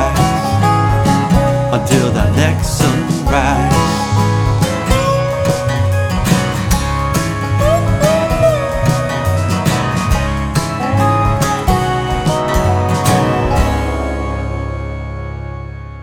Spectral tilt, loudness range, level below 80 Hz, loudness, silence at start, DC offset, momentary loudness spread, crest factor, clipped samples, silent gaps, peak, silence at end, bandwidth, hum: -5.5 dB/octave; 2 LU; -24 dBFS; -14 LUFS; 0 s; under 0.1%; 7 LU; 14 dB; under 0.1%; none; 0 dBFS; 0 s; 18.5 kHz; none